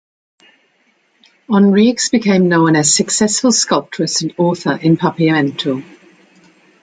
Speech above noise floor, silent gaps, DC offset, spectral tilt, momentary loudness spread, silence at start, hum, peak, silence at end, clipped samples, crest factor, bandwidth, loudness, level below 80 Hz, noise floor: 45 dB; none; under 0.1%; -4 dB/octave; 7 LU; 1.5 s; none; -2 dBFS; 1 s; under 0.1%; 14 dB; 9.6 kHz; -13 LUFS; -58 dBFS; -58 dBFS